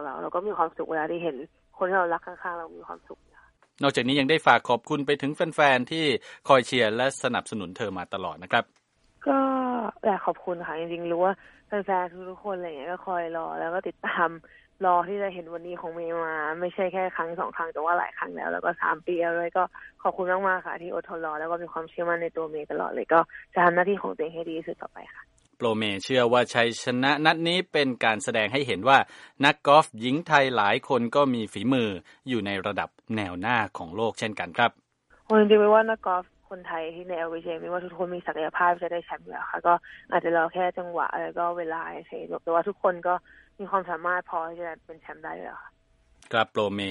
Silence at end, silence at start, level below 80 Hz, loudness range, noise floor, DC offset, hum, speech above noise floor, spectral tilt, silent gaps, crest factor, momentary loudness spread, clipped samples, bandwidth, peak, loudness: 0 s; 0 s; -66 dBFS; 7 LU; -60 dBFS; under 0.1%; none; 34 dB; -5 dB/octave; none; 24 dB; 14 LU; under 0.1%; 11.5 kHz; -2 dBFS; -26 LUFS